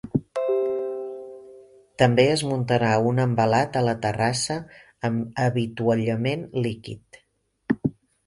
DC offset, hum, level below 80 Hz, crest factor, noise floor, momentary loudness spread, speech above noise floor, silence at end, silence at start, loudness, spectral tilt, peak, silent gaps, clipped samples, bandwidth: under 0.1%; none; -56 dBFS; 20 dB; -49 dBFS; 15 LU; 27 dB; 0.35 s; 0.05 s; -24 LUFS; -6 dB/octave; -4 dBFS; none; under 0.1%; 11.5 kHz